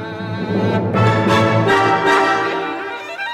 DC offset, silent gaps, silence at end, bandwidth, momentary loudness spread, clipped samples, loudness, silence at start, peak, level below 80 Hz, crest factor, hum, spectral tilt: under 0.1%; none; 0 s; 13 kHz; 11 LU; under 0.1%; -16 LUFS; 0 s; -4 dBFS; -48 dBFS; 12 dB; none; -6 dB/octave